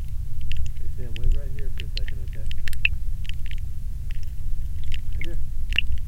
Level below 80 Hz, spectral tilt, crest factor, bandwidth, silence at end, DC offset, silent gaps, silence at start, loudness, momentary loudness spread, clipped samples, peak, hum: -26 dBFS; -4.5 dB/octave; 16 dB; 5.2 kHz; 0 s; under 0.1%; none; 0 s; -31 LUFS; 10 LU; under 0.1%; -4 dBFS; none